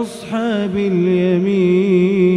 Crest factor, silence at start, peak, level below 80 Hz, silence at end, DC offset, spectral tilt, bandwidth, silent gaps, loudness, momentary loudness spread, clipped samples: 12 dB; 0 s; -4 dBFS; -52 dBFS; 0 s; under 0.1%; -8 dB/octave; 11 kHz; none; -16 LUFS; 6 LU; under 0.1%